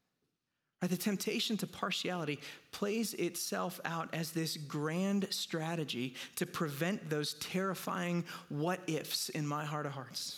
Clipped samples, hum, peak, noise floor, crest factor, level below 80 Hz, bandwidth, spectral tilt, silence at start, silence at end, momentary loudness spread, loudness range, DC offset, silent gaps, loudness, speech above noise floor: under 0.1%; none; -18 dBFS; -86 dBFS; 18 dB; -80 dBFS; 18.5 kHz; -4.5 dB/octave; 0.8 s; 0 s; 5 LU; 1 LU; under 0.1%; none; -37 LUFS; 49 dB